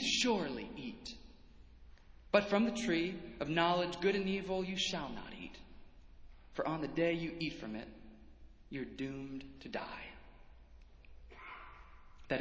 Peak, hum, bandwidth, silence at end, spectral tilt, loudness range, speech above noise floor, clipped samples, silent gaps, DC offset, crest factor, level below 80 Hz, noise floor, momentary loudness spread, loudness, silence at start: -14 dBFS; none; 8 kHz; 0 s; -4.5 dB/octave; 13 LU; 21 dB; under 0.1%; none; under 0.1%; 26 dB; -60 dBFS; -58 dBFS; 20 LU; -37 LUFS; 0 s